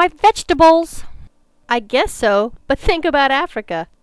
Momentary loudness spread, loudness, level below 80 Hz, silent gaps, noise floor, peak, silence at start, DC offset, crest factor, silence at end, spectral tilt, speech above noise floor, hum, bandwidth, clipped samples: 13 LU; -15 LUFS; -32 dBFS; none; -41 dBFS; -2 dBFS; 0 s; under 0.1%; 14 dB; 0.2 s; -4 dB/octave; 26 dB; none; 11 kHz; under 0.1%